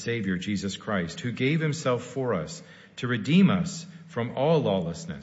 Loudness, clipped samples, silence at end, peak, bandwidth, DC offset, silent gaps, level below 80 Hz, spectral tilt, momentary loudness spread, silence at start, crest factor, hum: -27 LUFS; under 0.1%; 0 s; -10 dBFS; 8 kHz; under 0.1%; none; -60 dBFS; -6 dB/octave; 14 LU; 0 s; 16 dB; none